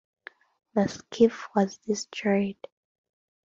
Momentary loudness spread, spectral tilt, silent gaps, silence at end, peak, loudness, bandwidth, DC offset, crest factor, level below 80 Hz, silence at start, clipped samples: 8 LU; -5.5 dB/octave; none; 0.9 s; -8 dBFS; -27 LUFS; 7.6 kHz; under 0.1%; 20 dB; -66 dBFS; 0.75 s; under 0.1%